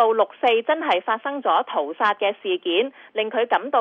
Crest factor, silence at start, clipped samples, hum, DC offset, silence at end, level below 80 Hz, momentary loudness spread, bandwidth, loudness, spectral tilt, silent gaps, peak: 16 dB; 0 s; under 0.1%; none; under 0.1%; 0 s; -78 dBFS; 6 LU; 6.6 kHz; -22 LUFS; -4.5 dB/octave; none; -6 dBFS